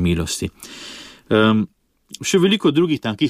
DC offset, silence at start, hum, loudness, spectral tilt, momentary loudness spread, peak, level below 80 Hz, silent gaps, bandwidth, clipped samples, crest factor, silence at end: under 0.1%; 0 s; none; -18 LUFS; -5 dB/octave; 19 LU; -4 dBFS; -42 dBFS; none; 15.5 kHz; under 0.1%; 16 dB; 0 s